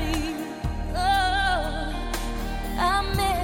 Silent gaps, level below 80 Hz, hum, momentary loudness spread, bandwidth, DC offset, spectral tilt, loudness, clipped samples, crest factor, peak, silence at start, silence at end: none; -30 dBFS; none; 9 LU; 17 kHz; under 0.1%; -4.5 dB/octave; -26 LUFS; under 0.1%; 14 dB; -10 dBFS; 0 s; 0 s